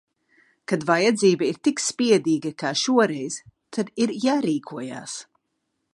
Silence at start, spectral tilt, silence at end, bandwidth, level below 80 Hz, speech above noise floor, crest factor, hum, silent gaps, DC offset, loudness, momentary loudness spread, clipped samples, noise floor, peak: 0.7 s; -4 dB/octave; 0.7 s; 11.5 kHz; -72 dBFS; 54 dB; 20 dB; none; none; under 0.1%; -23 LUFS; 14 LU; under 0.1%; -76 dBFS; -4 dBFS